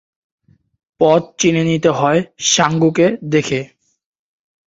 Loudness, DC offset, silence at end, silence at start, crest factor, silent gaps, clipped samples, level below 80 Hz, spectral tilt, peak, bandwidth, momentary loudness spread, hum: -15 LUFS; under 0.1%; 1 s; 1 s; 16 dB; none; under 0.1%; -54 dBFS; -4.5 dB/octave; 0 dBFS; 7.8 kHz; 5 LU; none